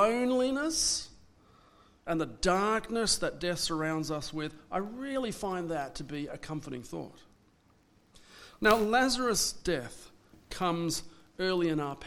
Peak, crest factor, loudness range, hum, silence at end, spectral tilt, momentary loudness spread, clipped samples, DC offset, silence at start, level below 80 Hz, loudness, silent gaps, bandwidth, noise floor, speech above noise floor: -8 dBFS; 24 dB; 7 LU; none; 0 s; -3.5 dB/octave; 14 LU; under 0.1%; under 0.1%; 0 s; -54 dBFS; -31 LUFS; none; 19 kHz; -65 dBFS; 34 dB